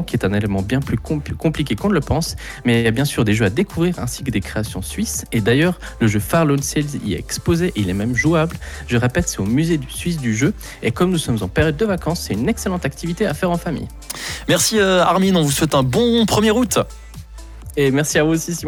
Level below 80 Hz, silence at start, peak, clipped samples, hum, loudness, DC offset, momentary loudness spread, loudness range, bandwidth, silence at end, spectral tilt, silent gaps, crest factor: -36 dBFS; 0 s; -4 dBFS; under 0.1%; none; -18 LUFS; under 0.1%; 9 LU; 4 LU; 19.5 kHz; 0 s; -5 dB/octave; none; 14 dB